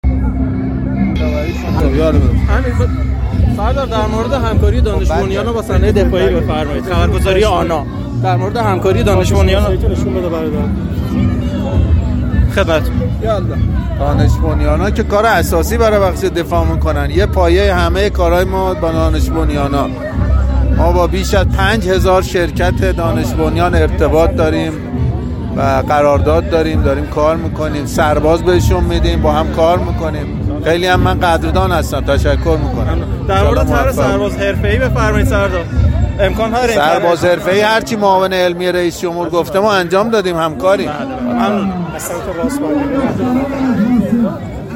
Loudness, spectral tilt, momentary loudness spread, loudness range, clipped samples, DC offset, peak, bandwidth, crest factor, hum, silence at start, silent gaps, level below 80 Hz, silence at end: -14 LUFS; -6.5 dB/octave; 6 LU; 2 LU; under 0.1%; under 0.1%; 0 dBFS; 16.5 kHz; 12 dB; none; 0.05 s; none; -18 dBFS; 0 s